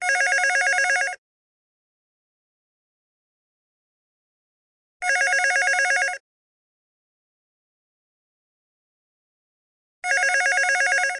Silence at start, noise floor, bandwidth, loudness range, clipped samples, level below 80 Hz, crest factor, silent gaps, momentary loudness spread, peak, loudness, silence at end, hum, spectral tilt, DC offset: 0 s; under -90 dBFS; 11.5 kHz; 9 LU; under 0.1%; -74 dBFS; 20 dB; 1.18-5.00 s, 6.20-10.02 s; 9 LU; -6 dBFS; -20 LUFS; 0 s; none; 4 dB/octave; under 0.1%